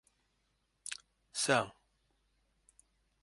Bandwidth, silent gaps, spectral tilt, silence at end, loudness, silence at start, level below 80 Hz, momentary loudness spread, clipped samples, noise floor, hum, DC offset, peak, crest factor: 11.5 kHz; none; -2.5 dB/octave; 1.5 s; -35 LUFS; 0.85 s; -76 dBFS; 16 LU; under 0.1%; -79 dBFS; none; under 0.1%; -14 dBFS; 28 dB